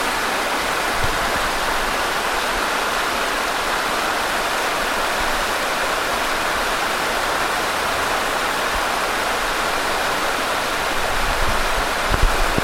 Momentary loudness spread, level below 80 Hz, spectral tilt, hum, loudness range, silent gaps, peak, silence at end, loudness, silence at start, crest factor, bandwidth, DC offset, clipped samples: 0 LU; -30 dBFS; -2 dB/octave; none; 0 LU; none; -2 dBFS; 0 s; -20 LUFS; 0 s; 18 dB; 16.5 kHz; under 0.1%; under 0.1%